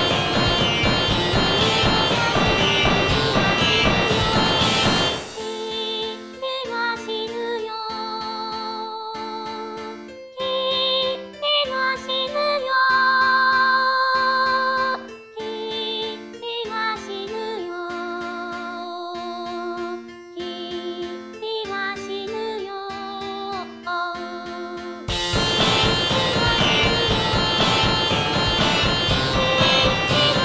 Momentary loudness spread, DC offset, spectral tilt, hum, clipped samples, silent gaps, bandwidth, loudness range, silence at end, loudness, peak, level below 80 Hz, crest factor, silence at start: 14 LU; under 0.1%; -4 dB/octave; none; under 0.1%; none; 8 kHz; 11 LU; 0 s; -20 LUFS; -6 dBFS; -40 dBFS; 16 dB; 0 s